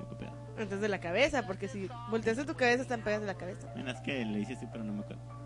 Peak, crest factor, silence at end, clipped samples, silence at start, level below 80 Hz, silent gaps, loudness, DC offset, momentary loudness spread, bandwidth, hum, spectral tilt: -14 dBFS; 20 dB; 0 s; under 0.1%; 0 s; -58 dBFS; none; -34 LUFS; under 0.1%; 13 LU; 11.5 kHz; none; -5.5 dB/octave